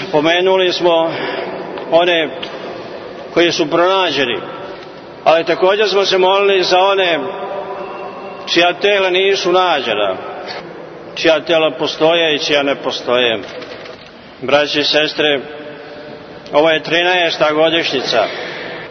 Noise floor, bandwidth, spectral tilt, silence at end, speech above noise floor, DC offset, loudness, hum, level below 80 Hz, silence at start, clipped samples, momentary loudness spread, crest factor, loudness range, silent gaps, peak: -35 dBFS; 6.6 kHz; -3.5 dB/octave; 0 s; 22 dB; under 0.1%; -14 LUFS; none; -56 dBFS; 0 s; under 0.1%; 17 LU; 16 dB; 3 LU; none; 0 dBFS